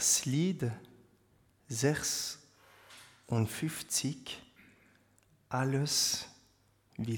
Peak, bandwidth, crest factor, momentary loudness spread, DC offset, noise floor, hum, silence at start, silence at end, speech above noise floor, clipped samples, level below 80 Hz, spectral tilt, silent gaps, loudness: -14 dBFS; 19 kHz; 20 dB; 21 LU; under 0.1%; -68 dBFS; none; 0 s; 0 s; 35 dB; under 0.1%; -68 dBFS; -3.5 dB/octave; none; -33 LUFS